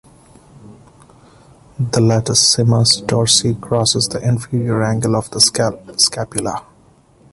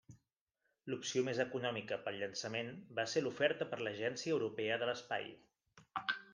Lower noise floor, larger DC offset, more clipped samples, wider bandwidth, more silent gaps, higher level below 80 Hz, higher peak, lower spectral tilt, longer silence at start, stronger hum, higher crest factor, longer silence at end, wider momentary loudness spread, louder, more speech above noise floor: second, -50 dBFS vs -86 dBFS; neither; neither; first, 12 kHz vs 10 kHz; second, none vs 0.41-0.47 s; first, -46 dBFS vs -82 dBFS; first, 0 dBFS vs -18 dBFS; about the same, -4 dB/octave vs -4 dB/octave; first, 0.6 s vs 0.1 s; neither; about the same, 18 dB vs 22 dB; first, 0.7 s vs 0 s; first, 10 LU vs 7 LU; first, -15 LUFS vs -39 LUFS; second, 34 dB vs 47 dB